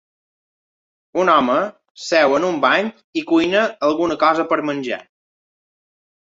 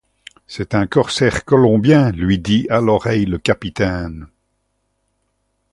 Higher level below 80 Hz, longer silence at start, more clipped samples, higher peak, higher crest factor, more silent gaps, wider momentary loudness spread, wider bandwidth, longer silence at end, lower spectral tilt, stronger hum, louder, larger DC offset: second, -62 dBFS vs -38 dBFS; first, 1.15 s vs 0.5 s; neither; about the same, -2 dBFS vs 0 dBFS; about the same, 18 dB vs 16 dB; first, 1.91-1.95 s, 3.04-3.13 s vs none; about the same, 12 LU vs 14 LU; second, 7.8 kHz vs 11.5 kHz; second, 1.3 s vs 1.45 s; second, -4.5 dB/octave vs -6.5 dB/octave; neither; about the same, -18 LUFS vs -16 LUFS; neither